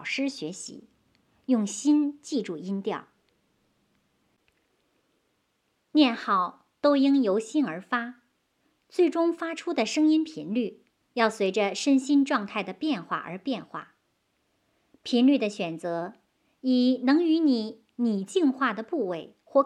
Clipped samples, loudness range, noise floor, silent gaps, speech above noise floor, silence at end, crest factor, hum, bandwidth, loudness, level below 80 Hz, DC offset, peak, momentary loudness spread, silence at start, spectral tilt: under 0.1%; 6 LU; -74 dBFS; none; 48 dB; 0 s; 18 dB; none; 11 kHz; -26 LUFS; -82 dBFS; under 0.1%; -8 dBFS; 13 LU; 0 s; -4.5 dB/octave